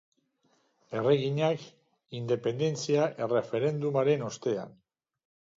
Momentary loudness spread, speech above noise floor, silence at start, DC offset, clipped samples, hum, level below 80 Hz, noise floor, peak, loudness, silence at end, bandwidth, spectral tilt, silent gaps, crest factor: 10 LU; 43 dB; 0.9 s; under 0.1%; under 0.1%; none; -76 dBFS; -71 dBFS; -12 dBFS; -29 LUFS; 0.85 s; 7.8 kHz; -6 dB/octave; none; 18 dB